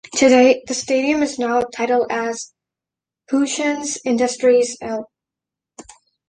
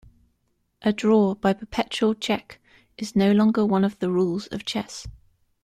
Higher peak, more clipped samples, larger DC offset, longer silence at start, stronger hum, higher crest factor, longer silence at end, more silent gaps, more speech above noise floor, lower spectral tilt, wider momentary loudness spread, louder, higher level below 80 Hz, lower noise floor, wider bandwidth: first, -2 dBFS vs -6 dBFS; neither; neither; second, 0.1 s vs 0.8 s; neither; about the same, 18 dB vs 16 dB; first, 1.25 s vs 0.55 s; neither; first, 70 dB vs 49 dB; second, -2.5 dB/octave vs -6 dB/octave; about the same, 13 LU vs 11 LU; first, -18 LUFS vs -23 LUFS; about the same, -58 dBFS vs -54 dBFS; first, -87 dBFS vs -71 dBFS; second, 10 kHz vs 12.5 kHz